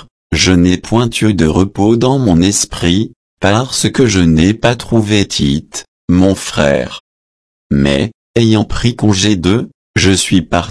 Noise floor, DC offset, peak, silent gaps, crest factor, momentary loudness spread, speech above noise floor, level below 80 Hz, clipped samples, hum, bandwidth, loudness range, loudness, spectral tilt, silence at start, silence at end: under -90 dBFS; under 0.1%; 0 dBFS; 3.16-3.37 s, 5.88-6.08 s, 7.00-7.70 s, 8.15-8.34 s, 9.74-9.94 s; 12 dB; 7 LU; over 79 dB; -30 dBFS; under 0.1%; none; 11 kHz; 3 LU; -12 LUFS; -5 dB/octave; 0.3 s; 0 s